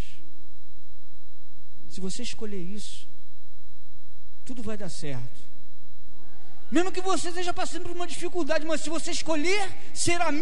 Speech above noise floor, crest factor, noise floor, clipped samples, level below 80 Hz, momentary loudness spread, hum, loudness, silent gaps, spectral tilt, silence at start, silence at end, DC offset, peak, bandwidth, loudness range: 25 dB; 22 dB; -56 dBFS; under 0.1%; -54 dBFS; 16 LU; none; -30 LUFS; none; -4 dB/octave; 0 s; 0 s; 10%; -8 dBFS; 11.5 kHz; 13 LU